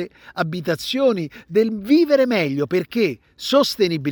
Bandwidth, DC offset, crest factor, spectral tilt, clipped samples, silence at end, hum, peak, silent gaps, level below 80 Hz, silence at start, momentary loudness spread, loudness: over 20 kHz; under 0.1%; 14 dB; -5.5 dB/octave; under 0.1%; 0 s; none; -6 dBFS; none; -60 dBFS; 0 s; 9 LU; -20 LUFS